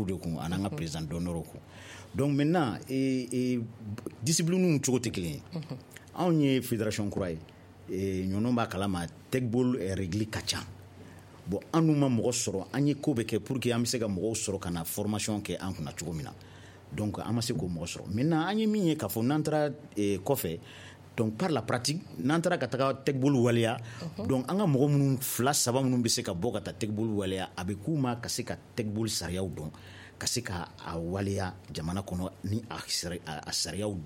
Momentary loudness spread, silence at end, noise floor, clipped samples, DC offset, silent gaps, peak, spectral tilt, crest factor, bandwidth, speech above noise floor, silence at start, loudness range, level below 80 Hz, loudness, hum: 13 LU; 0 s; -50 dBFS; under 0.1%; under 0.1%; none; -12 dBFS; -5 dB/octave; 18 dB; 16.5 kHz; 20 dB; 0 s; 6 LU; -58 dBFS; -31 LUFS; none